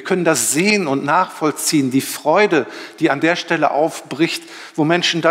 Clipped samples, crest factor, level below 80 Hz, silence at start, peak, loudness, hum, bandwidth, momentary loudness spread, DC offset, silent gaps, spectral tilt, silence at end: under 0.1%; 14 dB; -70 dBFS; 0 s; -2 dBFS; -17 LUFS; none; 16.5 kHz; 6 LU; under 0.1%; none; -3.5 dB/octave; 0 s